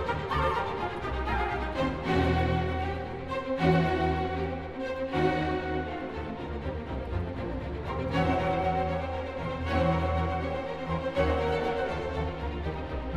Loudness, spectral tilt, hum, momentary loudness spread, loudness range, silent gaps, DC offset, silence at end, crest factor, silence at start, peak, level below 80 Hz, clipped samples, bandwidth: -30 LUFS; -7.5 dB/octave; none; 9 LU; 4 LU; none; 0.3%; 0 s; 18 dB; 0 s; -10 dBFS; -40 dBFS; under 0.1%; 11 kHz